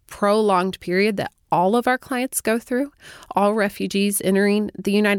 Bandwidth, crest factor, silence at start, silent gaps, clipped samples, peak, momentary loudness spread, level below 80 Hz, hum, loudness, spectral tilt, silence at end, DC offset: 17.5 kHz; 14 dB; 0.1 s; none; under 0.1%; -6 dBFS; 6 LU; -56 dBFS; none; -21 LUFS; -4.5 dB/octave; 0 s; under 0.1%